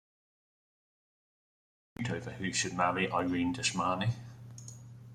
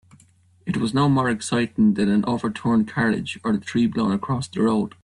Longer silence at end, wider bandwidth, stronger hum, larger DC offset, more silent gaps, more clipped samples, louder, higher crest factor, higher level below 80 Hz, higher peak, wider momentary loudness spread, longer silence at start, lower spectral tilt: second, 0 s vs 0.15 s; first, 13 kHz vs 11 kHz; neither; neither; neither; neither; second, -33 LUFS vs -22 LUFS; first, 22 dB vs 14 dB; second, -66 dBFS vs -54 dBFS; second, -14 dBFS vs -8 dBFS; first, 18 LU vs 6 LU; first, 2 s vs 0.65 s; second, -4 dB/octave vs -6.5 dB/octave